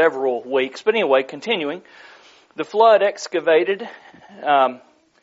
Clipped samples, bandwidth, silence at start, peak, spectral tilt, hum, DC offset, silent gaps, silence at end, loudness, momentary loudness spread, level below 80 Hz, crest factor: under 0.1%; 7.8 kHz; 0 s; -2 dBFS; -1 dB/octave; none; under 0.1%; none; 0.45 s; -19 LUFS; 14 LU; -78 dBFS; 18 dB